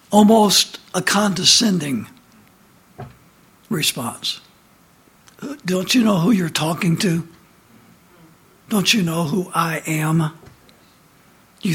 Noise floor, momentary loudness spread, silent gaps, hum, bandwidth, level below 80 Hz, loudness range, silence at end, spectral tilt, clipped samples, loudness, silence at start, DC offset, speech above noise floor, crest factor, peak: -53 dBFS; 18 LU; none; none; 17 kHz; -58 dBFS; 8 LU; 0 s; -4 dB/octave; under 0.1%; -18 LUFS; 0.1 s; under 0.1%; 35 dB; 20 dB; 0 dBFS